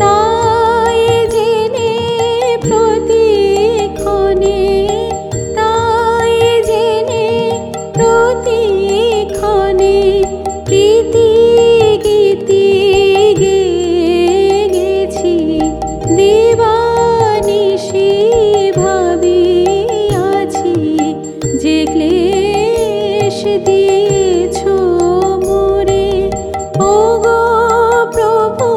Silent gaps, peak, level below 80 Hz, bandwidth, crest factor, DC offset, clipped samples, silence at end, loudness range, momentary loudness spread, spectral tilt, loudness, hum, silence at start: none; 0 dBFS; -34 dBFS; 13 kHz; 10 dB; under 0.1%; under 0.1%; 0 s; 3 LU; 5 LU; -5 dB/octave; -11 LUFS; none; 0 s